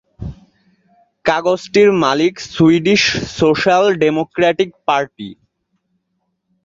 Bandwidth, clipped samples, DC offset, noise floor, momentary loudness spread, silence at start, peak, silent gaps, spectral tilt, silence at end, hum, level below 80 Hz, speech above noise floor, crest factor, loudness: 7.8 kHz; under 0.1%; under 0.1%; -70 dBFS; 17 LU; 0.2 s; 0 dBFS; none; -5 dB/octave; 1.35 s; none; -46 dBFS; 56 dB; 16 dB; -14 LUFS